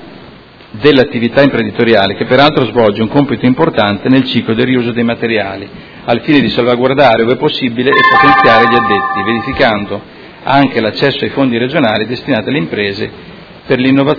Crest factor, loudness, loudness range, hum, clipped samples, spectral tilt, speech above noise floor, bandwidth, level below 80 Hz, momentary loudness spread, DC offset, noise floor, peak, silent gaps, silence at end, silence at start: 10 dB; -10 LUFS; 4 LU; none; 0.7%; -7.5 dB/octave; 25 dB; 5.4 kHz; -42 dBFS; 9 LU; under 0.1%; -36 dBFS; 0 dBFS; none; 0 s; 0 s